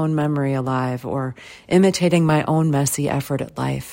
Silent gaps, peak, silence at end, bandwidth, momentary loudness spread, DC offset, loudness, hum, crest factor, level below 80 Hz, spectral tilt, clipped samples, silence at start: none; -4 dBFS; 0 s; 16.5 kHz; 10 LU; under 0.1%; -20 LUFS; none; 16 dB; -52 dBFS; -6 dB/octave; under 0.1%; 0 s